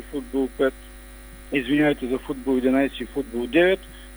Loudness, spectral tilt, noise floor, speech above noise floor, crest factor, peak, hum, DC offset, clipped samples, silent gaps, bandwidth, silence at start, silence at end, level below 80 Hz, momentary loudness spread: -23 LUFS; -5.5 dB/octave; -42 dBFS; 19 dB; 18 dB; -6 dBFS; none; under 0.1%; under 0.1%; none; over 20 kHz; 0 s; 0 s; -44 dBFS; 24 LU